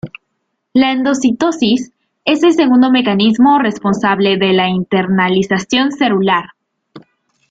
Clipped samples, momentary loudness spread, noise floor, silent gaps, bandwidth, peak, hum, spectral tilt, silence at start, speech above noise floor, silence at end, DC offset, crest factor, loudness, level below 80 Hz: under 0.1%; 6 LU; -70 dBFS; none; 8 kHz; -2 dBFS; none; -5.5 dB/octave; 0.05 s; 58 dB; 0.5 s; under 0.1%; 12 dB; -13 LUFS; -54 dBFS